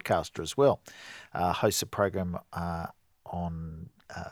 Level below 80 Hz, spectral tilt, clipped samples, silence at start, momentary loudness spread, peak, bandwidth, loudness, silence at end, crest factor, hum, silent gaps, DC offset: -54 dBFS; -4.5 dB/octave; under 0.1%; 0.05 s; 17 LU; -10 dBFS; 20 kHz; -30 LUFS; 0 s; 20 dB; none; none; under 0.1%